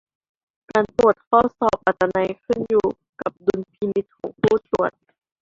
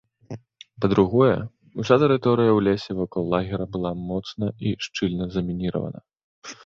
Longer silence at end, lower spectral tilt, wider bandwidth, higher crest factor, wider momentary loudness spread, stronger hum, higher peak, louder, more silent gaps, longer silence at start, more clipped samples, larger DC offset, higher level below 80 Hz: first, 0.55 s vs 0.15 s; about the same, -7 dB/octave vs -7 dB/octave; about the same, 7.8 kHz vs 7.4 kHz; about the same, 20 dB vs 20 dB; second, 9 LU vs 21 LU; neither; about the same, -2 dBFS vs -2 dBFS; about the same, -21 LUFS vs -23 LUFS; second, 1.27-1.31 s, 3.09-3.13 s vs 6.23-6.42 s; first, 0.75 s vs 0.3 s; neither; neither; about the same, -52 dBFS vs -48 dBFS